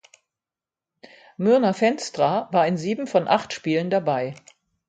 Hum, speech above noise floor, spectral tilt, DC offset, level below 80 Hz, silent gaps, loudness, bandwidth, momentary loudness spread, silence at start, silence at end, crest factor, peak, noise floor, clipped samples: none; over 69 dB; -5.5 dB/octave; under 0.1%; -70 dBFS; none; -22 LUFS; 9.2 kHz; 7 LU; 1.4 s; 0.55 s; 18 dB; -6 dBFS; under -90 dBFS; under 0.1%